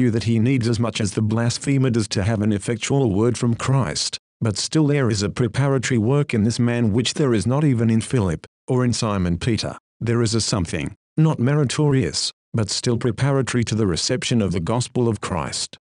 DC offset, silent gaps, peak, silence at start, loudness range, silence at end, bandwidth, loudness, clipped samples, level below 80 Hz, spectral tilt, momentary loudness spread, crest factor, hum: under 0.1%; 4.19-4.40 s, 8.47-8.68 s, 9.80-10.00 s, 10.96-11.16 s, 12.33-12.52 s; -6 dBFS; 0 s; 2 LU; 0.3 s; 11 kHz; -21 LUFS; under 0.1%; -46 dBFS; -5.5 dB/octave; 6 LU; 14 dB; none